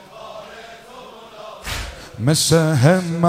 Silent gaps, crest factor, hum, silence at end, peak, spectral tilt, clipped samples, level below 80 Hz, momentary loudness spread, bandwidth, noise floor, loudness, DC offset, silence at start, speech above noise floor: none; 18 dB; none; 0 s; -2 dBFS; -5 dB/octave; under 0.1%; -42 dBFS; 24 LU; 16 kHz; -39 dBFS; -17 LUFS; under 0.1%; 0.15 s; 24 dB